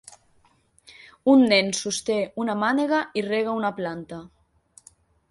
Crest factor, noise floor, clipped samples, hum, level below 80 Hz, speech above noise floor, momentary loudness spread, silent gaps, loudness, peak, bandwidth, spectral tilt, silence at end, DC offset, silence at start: 18 dB; -62 dBFS; under 0.1%; none; -64 dBFS; 39 dB; 14 LU; none; -23 LUFS; -6 dBFS; 11.5 kHz; -4 dB/octave; 1.05 s; under 0.1%; 1.25 s